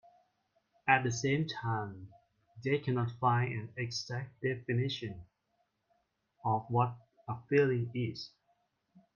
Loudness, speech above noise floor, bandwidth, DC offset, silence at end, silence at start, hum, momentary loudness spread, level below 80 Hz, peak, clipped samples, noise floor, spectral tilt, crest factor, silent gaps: -34 LUFS; 46 dB; 7.4 kHz; under 0.1%; 0.15 s; 0.85 s; none; 15 LU; -70 dBFS; -10 dBFS; under 0.1%; -79 dBFS; -6 dB/octave; 24 dB; none